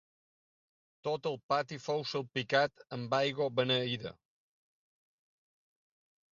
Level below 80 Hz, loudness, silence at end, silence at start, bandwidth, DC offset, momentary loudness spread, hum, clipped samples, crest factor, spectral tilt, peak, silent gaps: -76 dBFS; -34 LUFS; 2.2 s; 1.05 s; 7.4 kHz; under 0.1%; 9 LU; none; under 0.1%; 22 dB; -2.5 dB/octave; -14 dBFS; 1.43-1.49 s